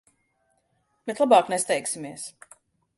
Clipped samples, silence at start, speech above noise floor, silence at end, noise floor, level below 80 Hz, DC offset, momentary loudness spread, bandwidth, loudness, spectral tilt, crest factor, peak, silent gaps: under 0.1%; 1.05 s; 47 dB; 0.65 s; -71 dBFS; -76 dBFS; under 0.1%; 19 LU; 11.5 kHz; -23 LUFS; -3 dB/octave; 22 dB; -6 dBFS; none